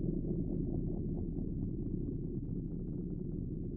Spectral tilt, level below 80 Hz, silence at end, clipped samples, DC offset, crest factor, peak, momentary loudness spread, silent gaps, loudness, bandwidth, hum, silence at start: -16.5 dB/octave; -44 dBFS; 0 s; under 0.1%; under 0.1%; 14 dB; -24 dBFS; 4 LU; none; -39 LUFS; 1.3 kHz; none; 0 s